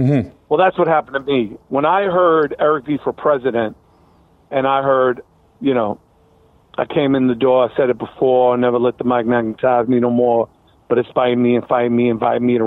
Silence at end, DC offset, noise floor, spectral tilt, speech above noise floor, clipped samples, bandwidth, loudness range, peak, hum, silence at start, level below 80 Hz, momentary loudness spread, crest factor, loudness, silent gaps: 0 s; under 0.1%; -52 dBFS; -9.5 dB/octave; 37 dB; under 0.1%; 4.1 kHz; 4 LU; -2 dBFS; none; 0 s; -54 dBFS; 7 LU; 14 dB; -17 LUFS; none